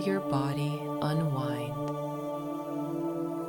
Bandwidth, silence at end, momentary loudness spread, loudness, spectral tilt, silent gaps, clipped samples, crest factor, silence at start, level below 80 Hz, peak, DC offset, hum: 18 kHz; 0 s; 6 LU; -32 LUFS; -7.5 dB/octave; none; under 0.1%; 16 dB; 0 s; -66 dBFS; -16 dBFS; under 0.1%; none